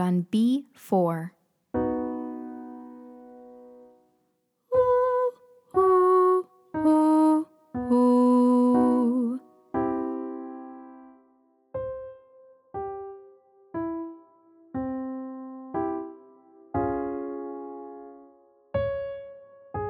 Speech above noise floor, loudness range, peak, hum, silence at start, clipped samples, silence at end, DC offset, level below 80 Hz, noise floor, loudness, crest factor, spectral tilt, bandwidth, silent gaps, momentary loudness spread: 48 dB; 15 LU; -12 dBFS; none; 0 s; under 0.1%; 0 s; under 0.1%; -58 dBFS; -73 dBFS; -25 LUFS; 16 dB; -8.5 dB/octave; 12 kHz; none; 21 LU